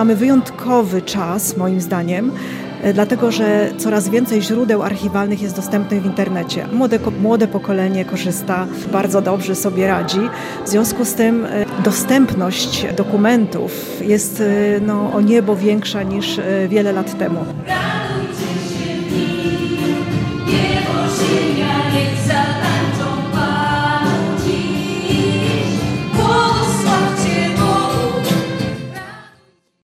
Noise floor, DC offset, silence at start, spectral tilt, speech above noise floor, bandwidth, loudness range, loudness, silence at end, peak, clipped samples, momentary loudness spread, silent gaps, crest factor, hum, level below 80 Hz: -53 dBFS; under 0.1%; 0 s; -5.5 dB/octave; 38 dB; 16 kHz; 3 LU; -17 LUFS; 0.7 s; -2 dBFS; under 0.1%; 6 LU; none; 14 dB; none; -44 dBFS